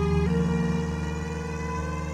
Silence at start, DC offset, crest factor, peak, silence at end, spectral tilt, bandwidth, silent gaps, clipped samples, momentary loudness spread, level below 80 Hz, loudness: 0 s; under 0.1%; 14 dB; -14 dBFS; 0 s; -7 dB/octave; 10 kHz; none; under 0.1%; 7 LU; -38 dBFS; -28 LUFS